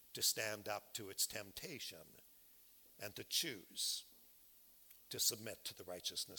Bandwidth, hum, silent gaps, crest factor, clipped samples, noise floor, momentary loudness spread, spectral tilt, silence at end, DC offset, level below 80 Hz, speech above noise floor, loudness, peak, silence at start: 17.5 kHz; none; none; 24 dB; under 0.1%; -66 dBFS; 25 LU; -0.5 dB/octave; 0 s; under 0.1%; -80 dBFS; 22 dB; -42 LUFS; -22 dBFS; 0 s